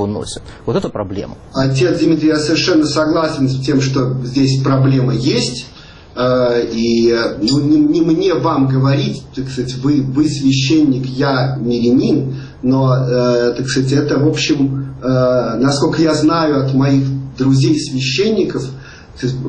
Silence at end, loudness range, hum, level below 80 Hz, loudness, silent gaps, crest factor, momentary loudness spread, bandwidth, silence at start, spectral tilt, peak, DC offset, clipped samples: 0 s; 1 LU; none; -42 dBFS; -14 LUFS; none; 12 dB; 9 LU; 9.8 kHz; 0 s; -6 dB/octave; -2 dBFS; under 0.1%; under 0.1%